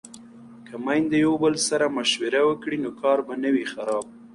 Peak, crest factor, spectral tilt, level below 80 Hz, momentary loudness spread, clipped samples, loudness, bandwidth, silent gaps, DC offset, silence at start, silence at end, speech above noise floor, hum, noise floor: -8 dBFS; 16 dB; -3.5 dB/octave; -62 dBFS; 8 LU; under 0.1%; -23 LUFS; 11.5 kHz; none; under 0.1%; 0.05 s; 0.05 s; 22 dB; none; -45 dBFS